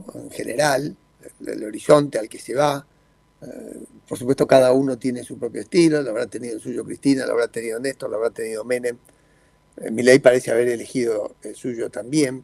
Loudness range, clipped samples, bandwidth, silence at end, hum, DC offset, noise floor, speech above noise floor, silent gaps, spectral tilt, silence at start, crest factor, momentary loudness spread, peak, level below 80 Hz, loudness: 4 LU; under 0.1%; 15 kHz; 0 s; none; under 0.1%; -58 dBFS; 38 dB; none; -5 dB/octave; 0 s; 20 dB; 18 LU; 0 dBFS; -60 dBFS; -21 LUFS